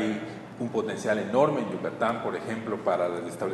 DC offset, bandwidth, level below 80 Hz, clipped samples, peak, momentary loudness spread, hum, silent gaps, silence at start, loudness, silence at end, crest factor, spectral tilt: under 0.1%; 12.5 kHz; -68 dBFS; under 0.1%; -8 dBFS; 8 LU; none; none; 0 s; -28 LUFS; 0 s; 20 dB; -6 dB/octave